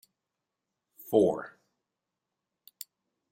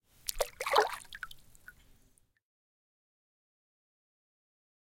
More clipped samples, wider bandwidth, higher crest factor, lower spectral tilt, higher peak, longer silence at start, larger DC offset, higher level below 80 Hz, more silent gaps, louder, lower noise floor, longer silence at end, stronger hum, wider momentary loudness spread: neither; about the same, 16 kHz vs 17 kHz; second, 24 dB vs 30 dB; first, -6.5 dB/octave vs -0.5 dB/octave; about the same, -10 dBFS vs -10 dBFS; first, 1.05 s vs 0.25 s; neither; second, -74 dBFS vs -58 dBFS; neither; first, -28 LUFS vs -33 LUFS; first, -87 dBFS vs -68 dBFS; second, 1.85 s vs 3.6 s; neither; first, 22 LU vs 18 LU